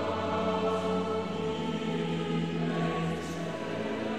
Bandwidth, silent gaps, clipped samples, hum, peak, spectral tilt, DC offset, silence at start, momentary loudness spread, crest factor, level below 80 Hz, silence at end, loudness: 11.5 kHz; none; under 0.1%; none; -18 dBFS; -6.5 dB/octave; 0.3%; 0 s; 5 LU; 12 dB; -60 dBFS; 0 s; -32 LUFS